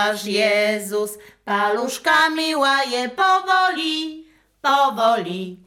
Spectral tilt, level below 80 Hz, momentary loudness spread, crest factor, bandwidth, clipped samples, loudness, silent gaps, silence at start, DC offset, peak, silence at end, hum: -2.5 dB/octave; -66 dBFS; 9 LU; 14 dB; 18 kHz; under 0.1%; -19 LUFS; none; 0 s; under 0.1%; -6 dBFS; 0.1 s; none